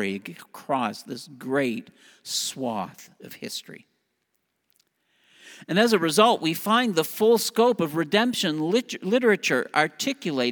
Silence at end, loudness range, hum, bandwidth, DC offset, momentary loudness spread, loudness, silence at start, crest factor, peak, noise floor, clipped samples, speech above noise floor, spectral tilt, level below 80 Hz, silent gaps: 0 s; 12 LU; none; over 20 kHz; under 0.1%; 17 LU; -23 LUFS; 0 s; 22 dB; -4 dBFS; -76 dBFS; under 0.1%; 51 dB; -4 dB/octave; -78 dBFS; none